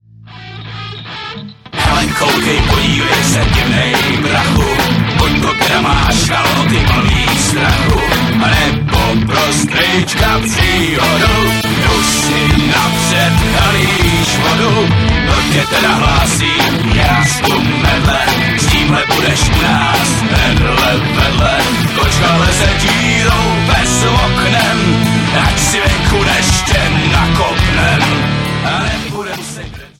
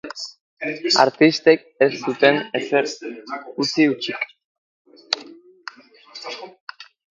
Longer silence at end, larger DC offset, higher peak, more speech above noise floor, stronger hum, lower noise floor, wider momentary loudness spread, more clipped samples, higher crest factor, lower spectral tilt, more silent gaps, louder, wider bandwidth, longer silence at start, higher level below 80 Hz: second, 0.15 s vs 0.3 s; neither; about the same, 0 dBFS vs 0 dBFS; about the same, 22 dB vs 25 dB; neither; second, -33 dBFS vs -44 dBFS; second, 3 LU vs 23 LU; neither; second, 12 dB vs 22 dB; about the same, -4 dB/octave vs -4 dB/octave; second, none vs 0.41-0.57 s, 4.45-4.85 s, 6.60-6.67 s; first, -11 LUFS vs -19 LUFS; first, 17 kHz vs 9 kHz; first, 0.2 s vs 0.05 s; first, -22 dBFS vs -72 dBFS